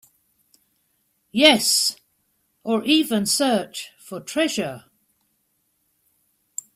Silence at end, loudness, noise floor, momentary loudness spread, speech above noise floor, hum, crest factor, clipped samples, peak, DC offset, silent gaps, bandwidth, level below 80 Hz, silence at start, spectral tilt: 1.95 s; -19 LUFS; -70 dBFS; 21 LU; 50 dB; none; 24 dB; under 0.1%; 0 dBFS; under 0.1%; none; 16 kHz; -66 dBFS; 1.35 s; -2 dB/octave